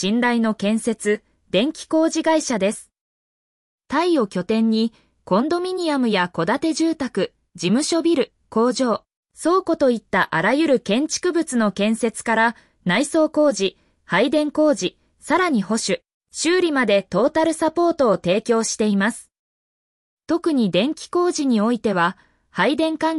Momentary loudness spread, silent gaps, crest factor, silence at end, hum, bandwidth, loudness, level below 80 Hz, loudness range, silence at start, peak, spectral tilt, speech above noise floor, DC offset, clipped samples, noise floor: 6 LU; 3.01-3.78 s, 9.16-9.23 s, 16.14-16.21 s, 19.39-20.17 s; 14 dB; 0 s; none; 12 kHz; -20 LUFS; -60 dBFS; 2 LU; 0 s; -6 dBFS; -4.5 dB/octave; over 71 dB; under 0.1%; under 0.1%; under -90 dBFS